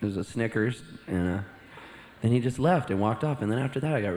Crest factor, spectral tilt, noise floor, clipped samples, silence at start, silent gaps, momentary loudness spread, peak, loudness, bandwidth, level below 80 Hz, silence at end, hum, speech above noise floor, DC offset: 18 dB; -7.5 dB/octave; -48 dBFS; under 0.1%; 0 s; none; 19 LU; -10 dBFS; -28 LUFS; 12 kHz; -56 dBFS; 0 s; none; 21 dB; under 0.1%